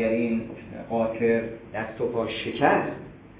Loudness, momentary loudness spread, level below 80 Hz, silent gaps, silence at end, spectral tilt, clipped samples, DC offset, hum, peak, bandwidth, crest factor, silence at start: -26 LUFS; 12 LU; -54 dBFS; none; 0 s; -10 dB/octave; under 0.1%; under 0.1%; none; -6 dBFS; 4 kHz; 20 dB; 0 s